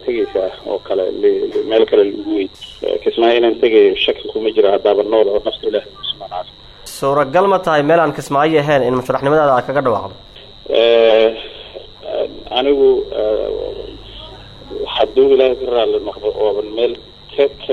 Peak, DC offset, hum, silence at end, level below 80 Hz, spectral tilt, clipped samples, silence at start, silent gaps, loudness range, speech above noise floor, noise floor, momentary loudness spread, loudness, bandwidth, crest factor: 0 dBFS; under 0.1%; none; 0 s; -44 dBFS; -5.5 dB/octave; under 0.1%; 0 s; none; 3 LU; 22 dB; -36 dBFS; 17 LU; -15 LUFS; 12.5 kHz; 14 dB